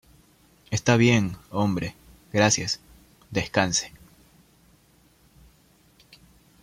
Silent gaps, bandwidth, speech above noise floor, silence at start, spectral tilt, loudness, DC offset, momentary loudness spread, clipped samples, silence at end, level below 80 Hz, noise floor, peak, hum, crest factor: none; 15.5 kHz; 37 dB; 0.7 s; -4 dB/octave; -24 LUFS; under 0.1%; 12 LU; under 0.1%; 2.75 s; -54 dBFS; -59 dBFS; -4 dBFS; none; 24 dB